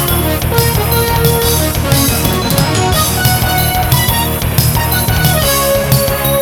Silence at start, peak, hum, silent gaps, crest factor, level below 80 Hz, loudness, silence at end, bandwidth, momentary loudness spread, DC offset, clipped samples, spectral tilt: 0 s; 0 dBFS; none; none; 12 dB; -22 dBFS; -11 LUFS; 0 s; over 20 kHz; 2 LU; under 0.1%; under 0.1%; -4 dB/octave